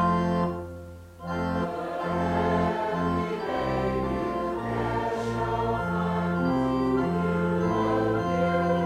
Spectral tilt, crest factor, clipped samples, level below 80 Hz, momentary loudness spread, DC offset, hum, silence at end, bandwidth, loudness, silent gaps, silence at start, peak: -8 dB/octave; 14 dB; under 0.1%; -46 dBFS; 6 LU; under 0.1%; none; 0 s; 10 kHz; -27 LUFS; none; 0 s; -12 dBFS